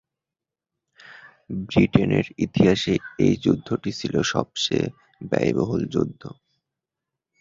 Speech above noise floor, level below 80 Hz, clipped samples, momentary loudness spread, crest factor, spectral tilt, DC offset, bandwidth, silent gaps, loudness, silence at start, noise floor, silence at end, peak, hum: 66 dB; -48 dBFS; under 0.1%; 11 LU; 22 dB; -6 dB/octave; under 0.1%; 7.8 kHz; none; -23 LUFS; 1.05 s; -88 dBFS; 1.1 s; -2 dBFS; none